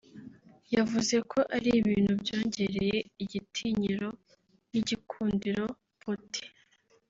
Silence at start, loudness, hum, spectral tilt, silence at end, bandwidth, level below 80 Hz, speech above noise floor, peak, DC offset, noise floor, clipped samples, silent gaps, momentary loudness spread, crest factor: 0.15 s; -31 LUFS; none; -5 dB/octave; 0.6 s; 7.8 kHz; -60 dBFS; 37 dB; -14 dBFS; under 0.1%; -66 dBFS; under 0.1%; none; 12 LU; 18 dB